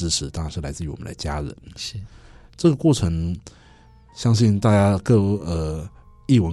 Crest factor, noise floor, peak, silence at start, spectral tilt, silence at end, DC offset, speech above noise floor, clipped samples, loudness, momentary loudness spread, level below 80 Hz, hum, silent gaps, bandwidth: 16 dB; -50 dBFS; -6 dBFS; 0 s; -6 dB/octave; 0 s; under 0.1%; 29 dB; under 0.1%; -22 LUFS; 16 LU; -38 dBFS; none; none; 12 kHz